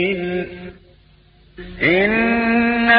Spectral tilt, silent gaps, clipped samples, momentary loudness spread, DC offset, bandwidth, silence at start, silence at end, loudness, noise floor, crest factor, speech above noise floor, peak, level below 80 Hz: -10.5 dB/octave; none; under 0.1%; 22 LU; under 0.1%; 5.2 kHz; 0 s; 0 s; -17 LUFS; -51 dBFS; 16 dB; 32 dB; -4 dBFS; -44 dBFS